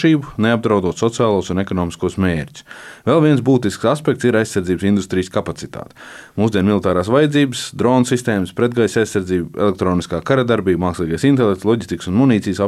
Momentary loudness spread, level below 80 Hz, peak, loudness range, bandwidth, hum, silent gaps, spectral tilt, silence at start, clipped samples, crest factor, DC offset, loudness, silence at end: 8 LU; -46 dBFS; -2 dBFS; 2 LU; 13.5 kHz; none; none; -6.5 dB/octave; 0 s; under 0.1%; 14 dB; under 0.1%; -17 LUFS; 0 s